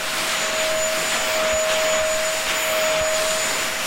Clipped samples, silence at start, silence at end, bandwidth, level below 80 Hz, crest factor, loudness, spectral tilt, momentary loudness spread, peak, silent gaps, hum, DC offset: under 0.1%; 0 s; 0 s; 16 kHz; -46 dBFS; 14 dB; -20 LUFS; 0 dB/octave; 2 LU; -8 dBFS; none; none; under 0.1%